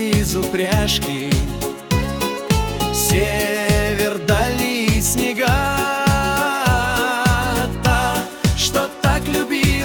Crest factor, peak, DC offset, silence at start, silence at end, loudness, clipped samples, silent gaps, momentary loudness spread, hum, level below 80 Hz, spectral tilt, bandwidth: 16 dB; -2 dBFS; under 0.1%; 0 s; 0 s; -18 LUFS; under 0.1%; none; 4 LU; none; -28 dBFS; -4 dB/octave; 19 kHz